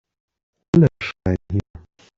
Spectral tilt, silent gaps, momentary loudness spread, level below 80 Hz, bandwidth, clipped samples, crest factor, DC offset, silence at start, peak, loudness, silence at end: -8.5 dB/octave; none; 10 LU; -46 dBFS; 7.4 kHz; under 0.1%; 18 dB; under 0.1%; 0.75 s; -4 dBFS; -20 LUFS; 0.6 s